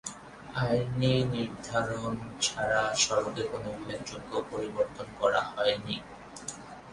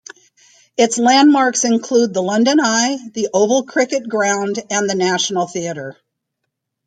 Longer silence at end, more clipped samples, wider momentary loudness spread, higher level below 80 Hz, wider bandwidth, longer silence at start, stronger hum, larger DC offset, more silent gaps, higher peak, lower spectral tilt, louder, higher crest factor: second, 0 s vs 0.95 s; neither; first, 14 LU vs 11 LU; first, -56 dBFS vs -66 dBFS; first, 11.5 kHz vs 9.4 kHz; second, 0.05 s vs 0.8 s; neither; neither; neither; second, -12 dBFS vs -2 dBFS; about the same, -4 dB/octave vs -3 dB/octave; second, -30 LUFS vs -16 LUFS; about the same, 18 dB vs 16 dB